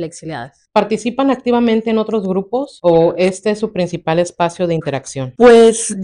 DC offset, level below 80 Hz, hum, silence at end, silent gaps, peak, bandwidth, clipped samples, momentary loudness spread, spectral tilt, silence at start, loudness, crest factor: under 0.1%; -48 dBFS; none; 0 s; none; 0 dBFS; 11 kHz; under 0.1%; 14 LU; -5 dB/octave; 0 s; -14 LUFS; 14 dB